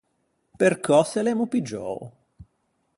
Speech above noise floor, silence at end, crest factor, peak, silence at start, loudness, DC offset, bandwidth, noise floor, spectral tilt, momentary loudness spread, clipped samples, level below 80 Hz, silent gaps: 49 dB; 0.55 s; 20 dB; -6 dBFS; 0.6 s; -23 LUFS; under 0.1%; 11.5 kHz; -72 dBFS; -5.5 dB/octave; 13 LU; under 0.1%; -62 dBFS; none